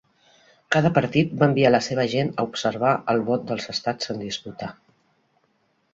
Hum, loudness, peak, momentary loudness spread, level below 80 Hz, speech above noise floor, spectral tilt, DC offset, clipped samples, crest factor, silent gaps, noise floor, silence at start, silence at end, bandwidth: none; -22 LUFS; -2 dBFS; 12 LU; -60 dBFS; 45 dB; -6 dB/octave; under 0.1%; under 0.1%; 22 dB; none; -67 dBFS; 0.7 s; 1.2 s; 8 kHz